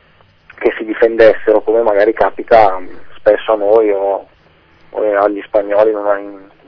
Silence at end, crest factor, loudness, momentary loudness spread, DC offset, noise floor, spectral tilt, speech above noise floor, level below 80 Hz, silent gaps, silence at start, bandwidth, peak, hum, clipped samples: 0.05 s; 14 dB; -13 LUFS; 9 LU; under 0.1%; -48 dBFS; -7 dB/octave; 36 dB; -46 dBFS; none; 0.1 s; 5.4 kHz; 0 dBFS; none; 0.9%